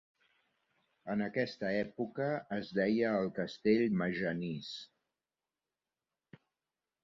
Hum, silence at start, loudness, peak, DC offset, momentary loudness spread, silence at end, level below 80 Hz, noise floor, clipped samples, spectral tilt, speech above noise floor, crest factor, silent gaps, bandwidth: none; 1.05 s; -35 LUFS; -18 dBFS; under 0.1%; 10 LU; 2.2 s; -72 dBFS; under -90 dBFS; under 0.1%; -5.5 dB/octave; over 56 dB; 20 dB; none; 7.4 kHz